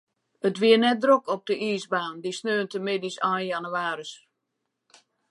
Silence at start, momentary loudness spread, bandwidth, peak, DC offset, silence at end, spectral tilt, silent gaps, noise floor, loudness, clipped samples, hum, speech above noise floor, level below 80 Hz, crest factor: 0.45 s; 11 LU; 11.5 kHz; -6 dBFS; under 0.1%; 1.15 s; -4.5 dB/octave; none; -81 dBFS; -25 LUFS; under 0.1%; none; 56 dB; -82 dBFS; 20 dB